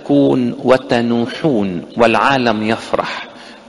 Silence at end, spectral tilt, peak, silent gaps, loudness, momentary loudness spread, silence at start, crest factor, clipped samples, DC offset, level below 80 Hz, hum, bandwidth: 0.1 s; -6 dB/octave; 0 dBFS; none; -15 LUFS; 9 LU; 0 s; 16 dB; under 0.1%; under 0.1%; -50 dBFS; none; 11.5 kHz